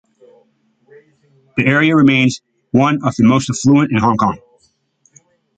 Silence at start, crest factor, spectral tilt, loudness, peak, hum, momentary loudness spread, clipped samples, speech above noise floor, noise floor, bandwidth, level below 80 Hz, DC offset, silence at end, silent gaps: 1.55 s; 14 dB; -6 dB/octave; -14 LUFS; 0 dBFS; none; 8 LU; under 0.1%; 47 dB; -59 dBFS; 9.2 kHz; -50 dBFS; under 0.1%; 1.2 s; none